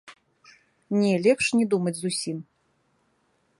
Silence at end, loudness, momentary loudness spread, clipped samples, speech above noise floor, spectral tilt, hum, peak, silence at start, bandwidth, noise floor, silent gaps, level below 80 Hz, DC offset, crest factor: 1.15 s; -24 LUFS; 10 LU; under 0.1%; 46 dB; -5 dB/octave; none; -8 dBFS; 0.05 s; 11.5 kHz; -69 dBFS; none; -68 dBFS; under 0.1%; 20 dB